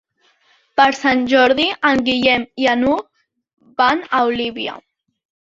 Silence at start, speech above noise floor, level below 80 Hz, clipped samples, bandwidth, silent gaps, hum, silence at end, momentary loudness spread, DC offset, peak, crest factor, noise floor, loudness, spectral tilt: 0.75 s; 42 dB; -52 dBFS; under 0.1%; 7.6 kHz; none; none; 0.6 s; 10 LU; under 0.1%; -2 dBFS; 16 dB; -58 dBFS; -16 LUFS; -4 dB/octave